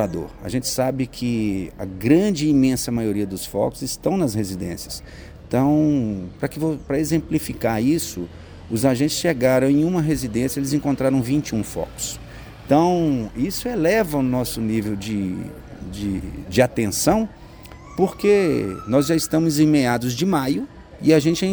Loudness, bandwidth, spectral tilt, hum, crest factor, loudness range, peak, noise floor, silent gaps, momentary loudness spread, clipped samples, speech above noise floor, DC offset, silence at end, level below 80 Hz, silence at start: -21 LUFS; over 20 kHz; -5.5 dB/octave; none; 20 dB; 3 LU; 0 dBFS; -40 dBFS; none; 13 LU; under 0.1%; 20 dB; under 0.1%; 0 s; -42 dBFS; 0 s